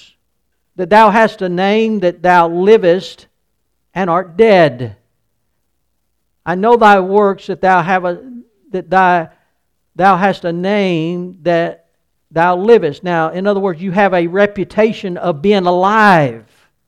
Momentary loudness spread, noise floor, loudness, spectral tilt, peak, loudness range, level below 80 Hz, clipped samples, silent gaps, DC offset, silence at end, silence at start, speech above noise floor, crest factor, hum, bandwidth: 13 LU; -68 dBFS; -12 LUFS; -7 dB/octave; 0 dBFS; 4 LU; -52 dBFS; 0.2%; none; under 0.1%; 0.45 s; 0.8 s; 57 dB; 14 dB; none; 11 kHz